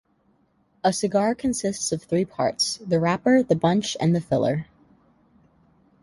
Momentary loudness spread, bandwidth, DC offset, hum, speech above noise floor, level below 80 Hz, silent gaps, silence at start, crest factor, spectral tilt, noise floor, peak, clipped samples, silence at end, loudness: 6 LU; 11.5 kHz; under 0.1%; none; 42 dB; -58 dBFS; none; 0.85 s; 18 dB; -5 dB/octave; -64 dBFS; -6 dBFS; under 0.1%; 1.4 s; -23 LUFS